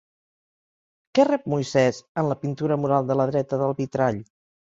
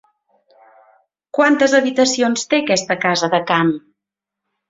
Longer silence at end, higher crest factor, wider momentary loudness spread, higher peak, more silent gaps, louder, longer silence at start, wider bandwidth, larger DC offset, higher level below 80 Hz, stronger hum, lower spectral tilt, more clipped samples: second, 0.45 s vs 0.9 s; about the same, 18 dB vs 18 dB; about the same, 6 LU vs 5 LU; second, -6 dBFS vs -2 dBFS; first, 2.09-2.15 s vs none; second, -23 LUFS vs -16 LUFS; second, 1.15 s vs 1.35 s; about the same, 7.8 kHz vs 7.8 kHz; neither; about the same, -62 dBFS vs -62 dBFS; neither; first, -7 dB/octave vs -3.5 dB/octave; neither